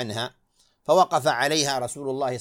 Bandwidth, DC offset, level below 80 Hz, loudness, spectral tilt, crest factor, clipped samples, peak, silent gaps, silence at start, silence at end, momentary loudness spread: 16.5 kHz; under 0.1%; -66 dBFS; -23 LUFS; -3 dB/octave; 18 dB; under 0.1%; -6 dBFS; none; 0 s; 0 s; 12 LU